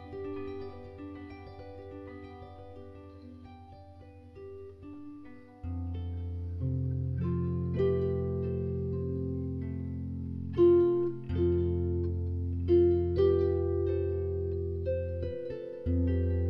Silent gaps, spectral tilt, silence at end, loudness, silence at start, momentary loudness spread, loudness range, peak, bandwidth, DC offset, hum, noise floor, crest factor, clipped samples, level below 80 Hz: none; -11.5 dB/octave; 0 s; -31 LUFS; 0 s; 22 LU; 20 LU; -14 dBFS; 5 kHz; under 0.1%; none; -51 dBFS; 18 dB; under 0.1%; -46 dBFS